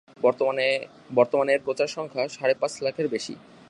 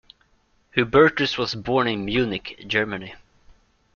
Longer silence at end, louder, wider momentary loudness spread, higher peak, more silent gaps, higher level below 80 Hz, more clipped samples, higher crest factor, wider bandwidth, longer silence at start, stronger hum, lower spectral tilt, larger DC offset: second, 0.3 s vs 0.8 s; second, -25 LUFS vs -22 LUFS; second, 7 LU vs 13 LU; second, -6 dBFS vs -2 dBFS; neither; second, -72 dBFS vs -50 dBFS; neither; about the same, 18 dB vs 22 dB; first, 11 kHz vs 7.2 kHz; second, 0.2 s vs 0.75 s; neither; second, -4 dB/octave vs -5.5 dB/octave; neither